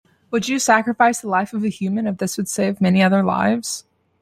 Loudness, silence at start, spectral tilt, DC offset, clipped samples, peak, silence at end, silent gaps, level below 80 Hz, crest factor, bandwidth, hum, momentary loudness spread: -19 LUFS; 0.3 s; -5 dB/octave; under 0.1%; under 0.1%; -2 dBFS; 0.4 s; none; -62 dBFS; 18 dB; 15 kHz; none; 8 LU